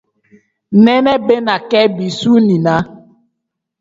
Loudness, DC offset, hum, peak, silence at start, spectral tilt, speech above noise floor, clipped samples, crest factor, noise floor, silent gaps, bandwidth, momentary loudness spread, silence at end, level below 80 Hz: -12 LUFS; under 0.1%; none; 0 dBFS; 0.7 s; -6.5 dB/octave; 64 dB; under 0.1%; 14 dB; -75 dBFS; none; 7.8 kHz; 7 LU; 0.85 s; -52 dBFS